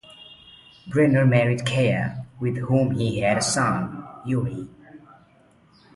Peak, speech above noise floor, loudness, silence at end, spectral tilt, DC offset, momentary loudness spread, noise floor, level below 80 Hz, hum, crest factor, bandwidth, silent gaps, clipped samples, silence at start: -4 dBFS; 35 dB; -22 LUFS; 0.95 s; -5.5 dB/octave; under 0.1%; 18 LU; -56 dBFS; -54 dBFS; none; 20 dB; 11.5 kHz; none; under 0.1%; 0.1 s